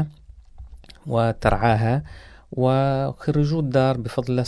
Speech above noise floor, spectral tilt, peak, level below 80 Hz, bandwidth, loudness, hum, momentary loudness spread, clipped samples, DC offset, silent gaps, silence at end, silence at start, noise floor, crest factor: 25 dB; -8 dB/octave; -2 dBFS; -38 dBFS; 11 kHz; -22 LUFS; none; 10 LU; under 0.1%; under 0.1%; none; 0 s; 0 s; -45 dBFS; 20 dB